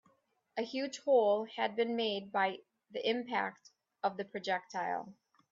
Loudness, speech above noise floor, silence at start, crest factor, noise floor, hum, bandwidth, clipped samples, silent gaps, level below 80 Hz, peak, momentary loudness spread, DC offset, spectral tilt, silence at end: -35 LUFS; 39 dB; 0.55 s; 18 dB; -73 dBFS; none; 7.8 kHz; under 0.1%; none; -86 dBFS; -18 dBFS; 12 LU; under 0.1%; -4 dB/octave; 0.4 s